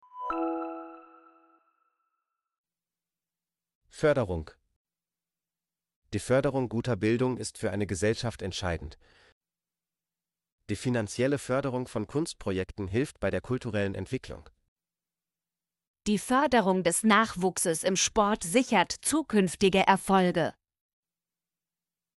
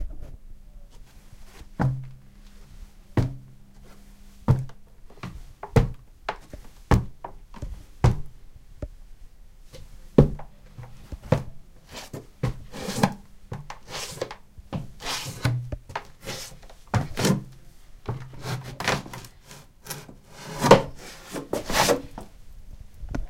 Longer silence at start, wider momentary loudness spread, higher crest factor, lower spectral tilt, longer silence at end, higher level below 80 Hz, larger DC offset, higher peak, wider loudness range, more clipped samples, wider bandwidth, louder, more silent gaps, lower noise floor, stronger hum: first, 0.15 s vs 0 s; second, 13 LU vs 23 LU; second, 22 dB vs 28 dB; about the same, -4.5 dB/octave vs -5.5 dB/octave; first, 1.65 s vs 0 s; second, -54 dBFS vs -38 dBFS; neither; second, -8 dBFS vs 0 dBFS; about the same, 10 LU vs 8 LU; neither; second, 11.5 kHz vs 16.5 kHz; about the same, -28 LUFS vs -27 LUFS; first, 2.58-2.64 s, 3.75-3.81 s, 4.76-4.85 s, 5.96-6.02 s, 9.32-9.41 s, 10.52-10.58 s, 14.68-14.76 s, 15.87-15.94 s vs none; first, under -90 dBFS vs -48 dBFS; neither